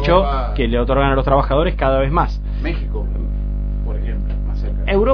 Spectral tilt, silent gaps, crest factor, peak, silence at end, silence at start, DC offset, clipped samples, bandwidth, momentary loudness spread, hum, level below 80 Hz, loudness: -9 dB/octave; none; 16 dB; 0 dBFS; 0 s; 0 s; under 0.1%; under 0.1%; 5.4 kHz; 8 LU; 50 Hz at -20 dBFS; -20 dBFS; -19 LUFS